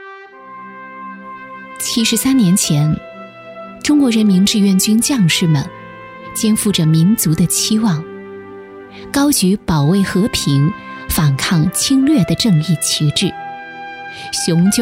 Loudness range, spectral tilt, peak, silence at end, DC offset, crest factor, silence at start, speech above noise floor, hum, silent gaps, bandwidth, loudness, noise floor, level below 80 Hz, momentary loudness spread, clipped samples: 3 LU; -4.5 dB/octave; -2 dBFS; 0 s; under 0.1%; 14 dB; 0 s; 22 dB; none; none; 16 kHz; -14 LUFS; -35 dBFS; -42 dBFS; 21 LU; under 0.1%